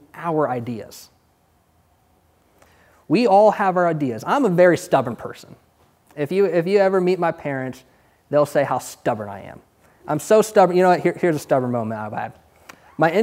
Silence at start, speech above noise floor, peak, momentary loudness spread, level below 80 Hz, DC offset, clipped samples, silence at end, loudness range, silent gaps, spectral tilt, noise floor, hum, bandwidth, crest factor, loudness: 0.15 s; 42 dB; -2 dBFS; 18 LU; -64 dBFS; under 0.1%; under 0.1%; 0 s; 4 LU; none; -6 dB/octave; -61 dBFS; none; 16 kHz; 18 dB; -19 LUFS